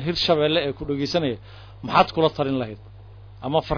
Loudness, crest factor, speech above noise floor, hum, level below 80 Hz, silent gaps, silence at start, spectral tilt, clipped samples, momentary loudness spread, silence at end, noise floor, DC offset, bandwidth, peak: -22 LUFS; 18 dB; 20 dB; none; -44 dBFS; none; 0 s; -6 dB/octave; under 0.1%; 16 LU; 0 s; -43 dBFS; under 0.1%; 5.4 kHz; -4 dBFS